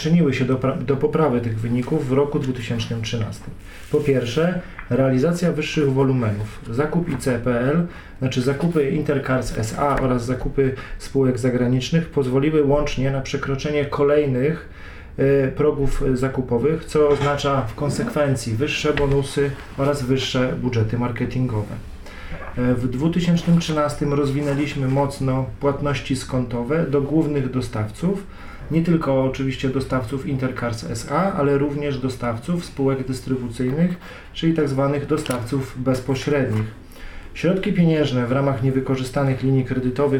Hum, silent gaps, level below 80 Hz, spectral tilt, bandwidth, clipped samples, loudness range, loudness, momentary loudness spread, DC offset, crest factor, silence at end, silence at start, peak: none; none; -36 dBFS; -7 dB/octave; 16 kHz; under 0.1%; 2 LU; -21 LUFS; 8 LU; under 0.1%; 16 dB; 0 s; 0 s; -6 dBFS